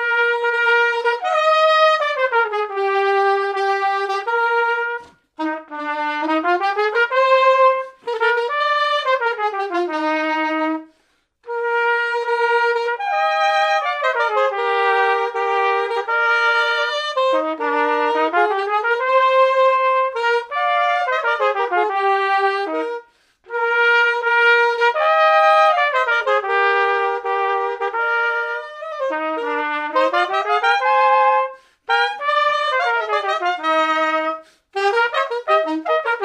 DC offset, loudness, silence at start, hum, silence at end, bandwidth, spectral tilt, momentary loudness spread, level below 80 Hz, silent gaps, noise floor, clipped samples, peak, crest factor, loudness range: under 0.1%; -18 LUFS; 0 s; none; 0 s; 10 kHz; -1 dB/octave; 8 LU; -74 dBFS; none; -63 dBFS; under 0.1%; -2 dBFS; 16 dB; 5 LU